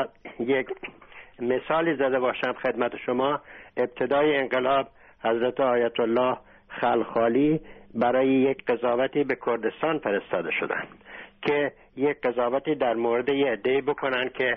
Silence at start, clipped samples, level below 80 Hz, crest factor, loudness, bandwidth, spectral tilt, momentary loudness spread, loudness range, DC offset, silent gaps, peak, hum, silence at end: 0 s; under 0.1%; -60 dBFS; 14 dB; -25 LUFS; 5.2 kHz; -3.5 dB/octave; 10 LU; 3 LU; under 0.1%; none; -10 dBFS; none; 0 s